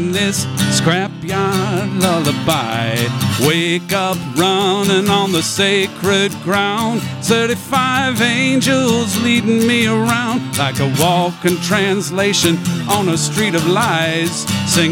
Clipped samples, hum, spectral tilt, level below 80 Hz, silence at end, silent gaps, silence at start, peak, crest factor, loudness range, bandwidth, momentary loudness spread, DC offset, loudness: under 0.1%; none; -4 dB/octave; -52 dBFS; 0 s; none; 0 s; 0 dBFS; 16 dB; 2 LU; 18 kHz; 4 LU; under 0.1%; -15 LUFS